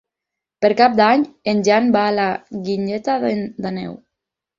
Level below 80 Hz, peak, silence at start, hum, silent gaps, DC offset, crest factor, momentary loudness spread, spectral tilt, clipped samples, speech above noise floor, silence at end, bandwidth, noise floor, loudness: -60 dBFS; -2 dBFS; 0.6 s; none; none; under 0.1%; 18 dB; 12 LU; -5.5 dB/octave; under 0.1%; 67 dB; 0.6 s; 7.4 kHz; -84 dBFS; -18 LUFS